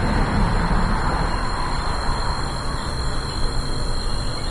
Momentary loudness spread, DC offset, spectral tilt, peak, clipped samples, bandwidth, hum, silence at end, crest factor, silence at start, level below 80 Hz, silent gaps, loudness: 5 LU; under 0.1%; -5 dB/octave; -8 dBFS; under 0.1%; 11.5 kHz; none; 0 s; 12 dB; 0 s; -24 dBFS; none; -24 LUFS